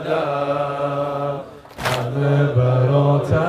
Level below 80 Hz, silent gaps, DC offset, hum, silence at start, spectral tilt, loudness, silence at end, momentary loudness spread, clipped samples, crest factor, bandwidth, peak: -48 dBFS; none; under 0.1%; none; 0 s; -7.5 dB/octave; -19 LUFS; 0 s; 10 LU; under 0.1%; 14 dB; 14.5 kHz; -4 dBFS